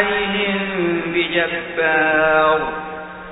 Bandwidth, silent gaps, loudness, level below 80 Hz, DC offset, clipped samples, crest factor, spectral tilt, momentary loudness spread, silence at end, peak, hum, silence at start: 4 kHz; none; -17 LUFS; -48 dBFS; under 0.1%; under 0.1%; 16 dB; -2 dB/octave; 11 LU; 0 s; -2 dBFS; none; 0 s